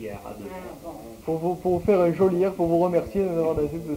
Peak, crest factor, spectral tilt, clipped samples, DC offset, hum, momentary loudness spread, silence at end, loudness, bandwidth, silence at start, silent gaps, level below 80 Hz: -8 dBFS; 16 dB; -8.5 dB/octave; under 0.1%; under 0.1%; none; 17 LU; 0 s; -23 LUFS; 16 kHz; 0 s; none; -48 dBFS